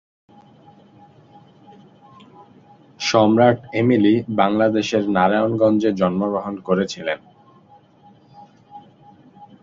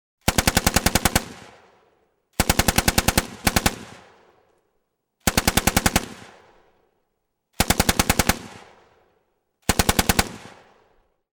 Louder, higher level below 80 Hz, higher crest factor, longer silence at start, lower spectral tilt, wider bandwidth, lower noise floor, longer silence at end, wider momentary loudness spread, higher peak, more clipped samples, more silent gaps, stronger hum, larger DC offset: first, -18 LUFS vs -21 LUFS; second, -58 dBFS vs -34 dBFS; about the same, 20 dB vs 20 dB; first, 3 s vs 0.25 s; first, -6 dB/octave vs -3 dB/octave; second, 7.6 kHz vs 19 kHz; second, -51 dBFS vs -75 dBFS; second, 0.2 s vs 0.85 s; second, 9 LU vs 13 LU; about the same, -2 dBFS vs -4 dBFS; neither; neither; neither; neither